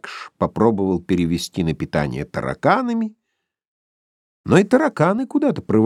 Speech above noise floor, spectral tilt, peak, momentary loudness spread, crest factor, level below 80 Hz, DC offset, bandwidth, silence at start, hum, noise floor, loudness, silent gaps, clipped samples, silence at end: 59 dB; -7 dB/octave; -2 dBFS; 9 LU; 18 dB; -48 dBFS; under 0.1%; 14 kHz; 0.05 s; none; -77 dBFS; -20 LUFS; 3.67-4.44 s; under 0.1%; 0 s